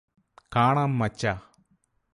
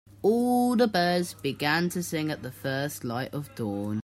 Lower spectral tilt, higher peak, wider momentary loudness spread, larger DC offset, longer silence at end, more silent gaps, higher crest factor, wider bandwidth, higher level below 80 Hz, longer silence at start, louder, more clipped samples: first, -6.5 dB/octave vs -5 dB/octave; about the same, -10 dBFS vs -10 dBFS; about the same, 8 LU vs 10 LU; neither; first, 0.75 s vs 0 s; neither; about the same, 18 dB vs 16 dB; second, 11.5 kHz vs 16 kHz; first, -54 dBFS vs -62 dBFS; first, 0.5 s vs 0.25 s; about the same, -25 LUFS vs -27 LUFS; neither